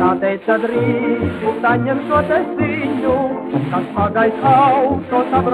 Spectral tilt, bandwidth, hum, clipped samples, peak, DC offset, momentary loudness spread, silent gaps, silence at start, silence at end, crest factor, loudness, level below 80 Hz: -8.5 dB/octave; 11 kHz; none; under 0.1%; -2 dBFS; under 0.1%; 7 LU; none; 0 s; 0 s; 14 dB; -16 LUFS; -48 dBFS